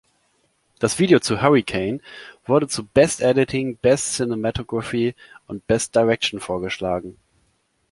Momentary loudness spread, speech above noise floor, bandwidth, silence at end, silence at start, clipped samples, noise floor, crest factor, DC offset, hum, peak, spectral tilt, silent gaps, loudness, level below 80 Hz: 11 LU; 46 dB; 11.5 kHz; 0.8 s; 0.8 s; under 0.1%; -66 dBFS; 20 dB; under 0.1%; none; -2 dBFS; -4.5 dB/octave; none; -20 LUFS; -48 dBFS